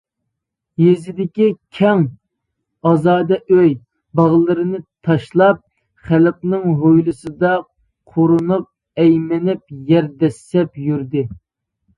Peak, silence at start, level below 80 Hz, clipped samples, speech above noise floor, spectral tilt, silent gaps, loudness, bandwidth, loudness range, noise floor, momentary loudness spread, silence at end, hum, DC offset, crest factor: 0 dBFS; 0.8 s; -54 dBFS; under 0.1%; 63 dB; -9 dB/octave; none; -16 LUFS; 10.5 kHz; 2 LU; -77 dBFS; 10 LU; 0.65 s; none; under 0.1%; 16 dB